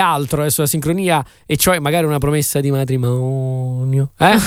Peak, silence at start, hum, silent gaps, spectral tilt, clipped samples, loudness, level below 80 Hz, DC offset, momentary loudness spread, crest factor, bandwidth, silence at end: 0 dBFS; 0 s; none; none; -5 dB/octave; under 0.1%; -17 LUFS; -40 dBFS; under 0.1%; 6 LU; 16 dB; 16.5 kHz; 0 s